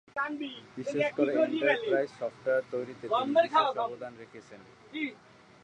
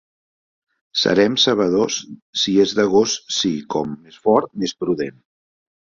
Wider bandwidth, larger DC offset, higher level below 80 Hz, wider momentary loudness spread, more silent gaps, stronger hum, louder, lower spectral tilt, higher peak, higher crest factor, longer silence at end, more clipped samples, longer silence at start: first, 9.6 kHz vs 7.6 kHz; neither; second, -76 dBFS vs -58 dBFS; first, 17 LU vs 10 LU; second, none vs 2.22-2.33 s; neither; second, -30 LUFS vs -19 LUFS; first, -5.5 dB/octave vs -3.5 dB/octave; second, -12 dBFS vs -2 dBFS; about the same, 18 dB vs 18 dB; second, 0.5 s vs 0.85 s; neither; second, 0.15 s vs 0.95 s